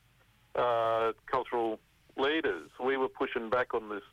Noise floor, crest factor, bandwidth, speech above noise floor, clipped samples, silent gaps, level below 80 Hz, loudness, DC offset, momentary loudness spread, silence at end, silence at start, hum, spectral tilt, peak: -65 dBFS; 12 dB; 12.5 kHz; 34 dB; under 0.1%; none; -66 dBFS; -32 LUFS; under 0.1%; 7 LU; 0.1 s; 0.55 s; none; -5.5 dB/octave; -20 dBFS